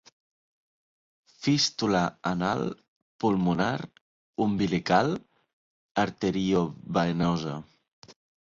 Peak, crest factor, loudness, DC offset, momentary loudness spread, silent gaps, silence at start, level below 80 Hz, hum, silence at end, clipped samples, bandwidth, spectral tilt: -8 dBFS; 20 dB; -27 LUFS; under 0.1%; 11 LU; 2.88-3.19 s, 4.01-4.33 s, 5.53-5.95 s, 7.93-8.02 s; 1.4 s; -58 dBFS; none; 0.35 s; under 0.1%; 7.6 kHz; -5.5 dB/octave